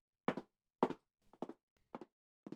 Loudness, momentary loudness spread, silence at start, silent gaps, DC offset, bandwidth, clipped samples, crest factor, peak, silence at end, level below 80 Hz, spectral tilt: -44 LUFS; 21 LU; 0.3 s; 1.63-1.76 s, 2.12-2.43 s; under 0.1%; 10.5 kHz; under 0.1%; 28 dB; -18 dBFS; 0 s; -84 dBFS; -7 dB/octave